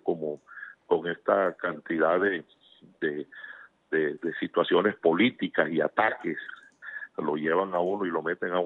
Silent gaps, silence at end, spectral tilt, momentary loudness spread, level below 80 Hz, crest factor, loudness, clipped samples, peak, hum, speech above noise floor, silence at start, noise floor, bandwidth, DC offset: none; 0 s; -8 dB/octave; 17 LU; -76 dBFS; 20 dB; -28 LUFS; under 0.1%; -8 dBFS; none; 19 dB; 0.05 s; -46 dBFS; 4.1 kHz; under 0.1%